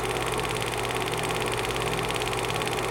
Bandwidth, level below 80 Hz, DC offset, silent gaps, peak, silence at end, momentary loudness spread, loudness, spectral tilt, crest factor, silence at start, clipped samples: 17 kHz; -44 dBFS; under 0.1%; none; -10 dBFS; 0 s; 1 LU; -27 LUFS; -3.5 dB/octave; 18 dB; 0 s; under 0.1%